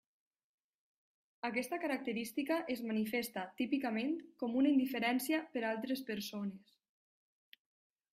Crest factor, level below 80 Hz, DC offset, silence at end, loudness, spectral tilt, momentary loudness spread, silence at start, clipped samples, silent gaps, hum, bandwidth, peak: 18 dB; -82 dBFS; under 0.1%; 1.55 s; -37 LUFS; -4.5 dB/octave; 9 LU; 1.45 s; under 0.1%; none; none; 15.5 kHz; -22 dBFS